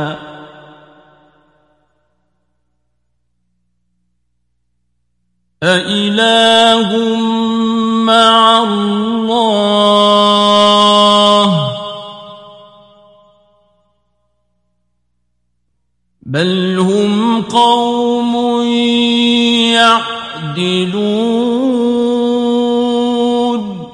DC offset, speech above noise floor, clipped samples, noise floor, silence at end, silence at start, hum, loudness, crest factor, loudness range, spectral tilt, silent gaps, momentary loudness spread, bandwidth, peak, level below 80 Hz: under 0.1%; 56 dB; under 0.1%; -68 dBFS; 0 s; 0 s; 60 Hz at -40 dBFS; -11 LUFS; 14 dB; 10 LU; -4.5 dB/octave; none; 10 LU; 11.5 kHz; 0 dBFS; -56 dBFS